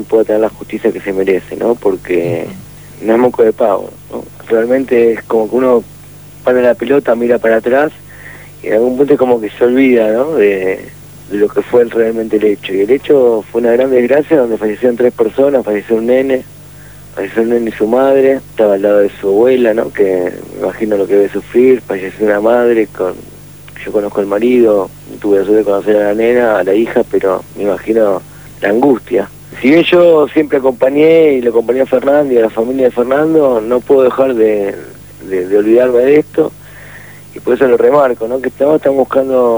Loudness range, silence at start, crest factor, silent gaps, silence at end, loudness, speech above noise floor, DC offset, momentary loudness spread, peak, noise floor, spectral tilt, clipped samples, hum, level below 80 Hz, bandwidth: 3 LU; 0 s; 12 dB; none; 0 s; -11 LUFS; 23 dB; 0.3%; 13 LU; 0 dBFS; -34 dBFS; -6.5 dB/octave; under 0.1%; 50 Hz at -40 dBFS; -46 dBFS; over 20 kHz